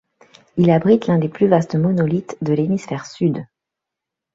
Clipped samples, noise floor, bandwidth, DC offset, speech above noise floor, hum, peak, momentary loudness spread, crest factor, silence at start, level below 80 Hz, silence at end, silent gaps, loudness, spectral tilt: under 0.1%; -84 dBFS; 7.6 kHz; under 0.1%; 67 dB; none; -2 dBFS; 8 LU; 16 dB; 0.55 s; -56 dBFS; 0.9 s; none; -18 LUFS; -8.5 dB/octave